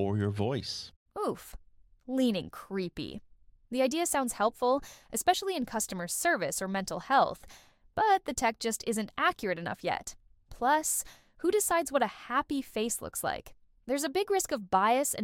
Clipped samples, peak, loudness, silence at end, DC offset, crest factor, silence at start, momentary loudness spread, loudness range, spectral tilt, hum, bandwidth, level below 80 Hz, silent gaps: under 0.1%; -12 dBFS; -31 LUFS; 0 s; under 0.1%; 20 dB; 0 s; 11 LU; 3 LU; -3.5 dB/octave; none; 17.5 kHz; -58 dBFS; 0.96-1.06 s